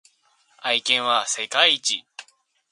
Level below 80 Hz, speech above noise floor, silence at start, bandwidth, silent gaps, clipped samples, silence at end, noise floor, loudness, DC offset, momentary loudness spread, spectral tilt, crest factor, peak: -80 dBFS; 41 dB; 0.6 s; 11.5 kHz; none; under 0.1%; 0.5 s; -63 dBFS; -20 LUFS; under 0.1%; 9 LU; 1 dB/octave; 22 dB; -2 dBFS